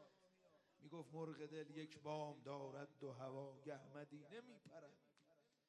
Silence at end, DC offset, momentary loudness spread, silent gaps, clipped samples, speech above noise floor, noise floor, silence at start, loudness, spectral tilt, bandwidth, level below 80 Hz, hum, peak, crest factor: 0.25 s; under 0.1%; 12 LU; none; under 0.1%; 25 dB; -79 dBFS; 0 s; -55 LUFS; -6.5 dB/octave; 10 kHz; under -90 dBFS; none; -34 dBFS; 20 dB